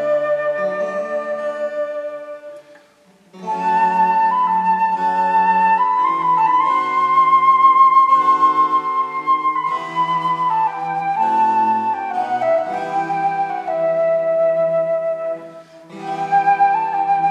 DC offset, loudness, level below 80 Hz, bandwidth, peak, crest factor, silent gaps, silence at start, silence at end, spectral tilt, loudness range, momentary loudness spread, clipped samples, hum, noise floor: under 0.1%; -17 LUFS; -80 dBFS; 9 kHz; -2 dBFS; 14 dB; none; 0 s; 0 s; -5.5 dB/octave; 7 LU; 11 LU; under 0.1%; none; -52 dBFS